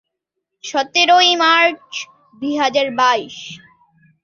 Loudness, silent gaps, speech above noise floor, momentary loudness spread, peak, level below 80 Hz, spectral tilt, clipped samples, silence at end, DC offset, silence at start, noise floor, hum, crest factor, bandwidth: -14 LUFS; none; 62 dB; 21 LU; -2 dBFS; -68 dBFS; -1.5 dB/octave; under 0.1%; 0.65 s; under 0.1%; 0.65 s; -78 dBFS; none; 16 dB; 7.4 kHz